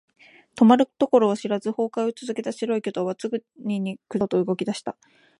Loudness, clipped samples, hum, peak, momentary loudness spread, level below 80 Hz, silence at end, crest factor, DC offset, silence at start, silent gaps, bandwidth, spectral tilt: -24 LUFS; under 0.1%; none; -2 dBFS; 12 LU; -70 dBFS; 0.5 s; 20 dB; under 0.1%; 0.55 s; none; 11 kHz; -6.5 dB/octave